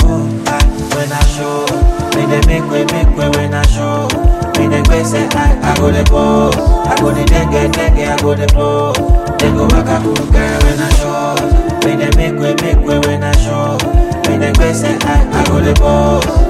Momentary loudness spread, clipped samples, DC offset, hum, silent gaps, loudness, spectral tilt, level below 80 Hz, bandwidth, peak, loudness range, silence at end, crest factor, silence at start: 3 LU; under 0.1%; under 0.1%; none; none; -12 LUFS; -5.5 dB/octave; -14 dBFS; 14.5 kHz; 0 dBFS; 2 LU; 0 s; 10 dB; 0 s